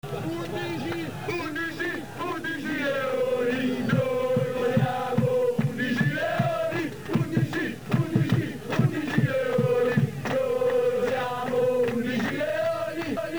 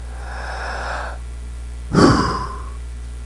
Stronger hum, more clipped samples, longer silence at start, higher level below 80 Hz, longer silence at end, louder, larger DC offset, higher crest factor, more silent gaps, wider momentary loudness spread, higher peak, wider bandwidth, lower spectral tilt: second, none vs 60 Hz at -30 dBFS; neither; about the same, 0 s vs 0 s; second, -58 dBFS vs -30 dBFS; about the same, 0 s vs 0 s; second, -26 LUFS vs -20 LUFS; first, 0.4% vs under 0.1%; about the same, 18 dB vs 20 dB; neither; second, 7 LU vs 19 LU; second, -8 dBFS vs 0 dBFS; first, over 20 kHz vs 11.5 kHz; about the same, -7 dB/octave vs -6 dB/octave